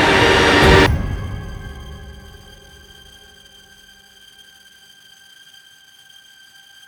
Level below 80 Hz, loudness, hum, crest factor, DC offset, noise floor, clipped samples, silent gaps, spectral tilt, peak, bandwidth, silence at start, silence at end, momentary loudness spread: -30 dBFS; -13 LUFS; none; 20 dB; under 0.1%; -47 dBFS; under 0.1%; none; -4.5 dB/octave; 0 dBFS; over 20 kHz; 0 s; 4.75 s; 27 LU